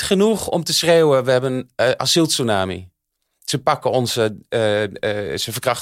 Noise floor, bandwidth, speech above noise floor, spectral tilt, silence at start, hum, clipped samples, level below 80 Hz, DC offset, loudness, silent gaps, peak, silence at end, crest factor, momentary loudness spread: -74 dBFS; 16.5 kHz; 56 dB; -4 dB/octave; 0 s; none; under 0.1%; -52 dBFS; under 0.1%; -18 LUFS; none; -4 dBFS; 0 s; 14 dB; 9 LU